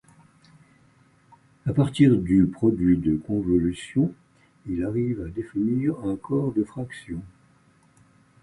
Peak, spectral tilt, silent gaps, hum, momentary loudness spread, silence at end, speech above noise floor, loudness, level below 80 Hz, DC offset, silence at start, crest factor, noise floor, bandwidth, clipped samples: -6 dBFS; -8.5 dB/octave; none; none; 14 LU; 1.15 s; 36 dB; -24 LUFS; -46 dBFS; under 0.1%; 1.65 s; 20 dB; -59 dBFS; 11 kHz; under 0.1%